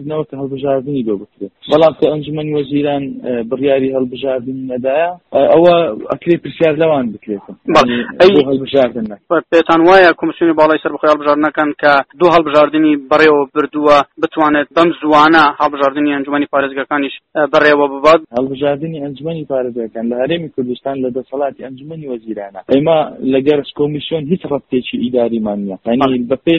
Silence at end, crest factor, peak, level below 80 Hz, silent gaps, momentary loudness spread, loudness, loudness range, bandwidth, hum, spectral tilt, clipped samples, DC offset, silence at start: 0 s; 12 dB; 0 dBFS; -50 dBFS; none; 12 LU; -13 LUFS; 6 LU; 8.4 kHz; none; -6.5 dB/octave; under 0.1%; under 0.1%; 0 s